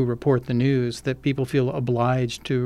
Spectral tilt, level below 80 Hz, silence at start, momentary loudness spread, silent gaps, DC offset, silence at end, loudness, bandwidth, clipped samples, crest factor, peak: -7 dB/octave; -50 dBFS; 0 s; 4 LU; none; under 0.1%; 0 s; -23 LUFS; 13 kHz; under 0.1%; 14 dB; -8 dBFS